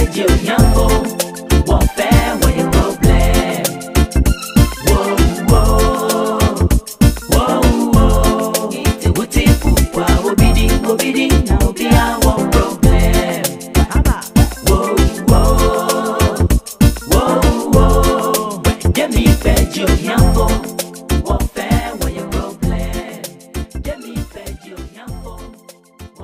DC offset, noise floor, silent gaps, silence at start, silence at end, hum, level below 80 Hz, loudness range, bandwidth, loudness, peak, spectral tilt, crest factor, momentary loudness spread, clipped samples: under 0.1%; -42 dBFS; none; 0 s; 0 s; none; -16 dBFS; 7 LU; 16 kHz; -14 LUFS; 0 dBFS; -5.5 dB/octave; 14 dB; 12 LU; under 0.1%